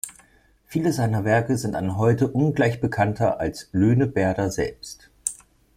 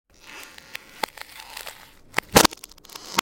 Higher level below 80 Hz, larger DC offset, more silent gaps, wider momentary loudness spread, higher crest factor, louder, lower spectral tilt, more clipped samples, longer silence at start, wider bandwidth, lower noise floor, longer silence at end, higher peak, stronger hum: about the same, -50 dBFS vs -46 dBFS; neither; neither; second, 9 LU vs 24 LU; second, 20 dB vs 26 dB; about the same, -23 LUFS vs -21 LUFS; first, -6.5 dB/octave vs -2.5 dB/octave; neither; second, 0.05 s vs 0.35 s; about the same, 15.5 kHz vs 17 kHz; first, -58 dBFS vs -44 dBFS; first, 0.4 s vs 0 s; second, -4 dBFS vs 0 dBFS; neither